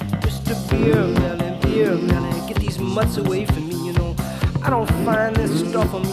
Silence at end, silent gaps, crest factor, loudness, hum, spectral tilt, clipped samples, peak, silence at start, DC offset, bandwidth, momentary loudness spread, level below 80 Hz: 0 s; none; 16 dB; -20 LUFS; none; -6.5 dB/octave; under 0.1%; -4 dBFS; 0 s; under 0.1%; 15.5 kHz; 5 LU; -30 dBFS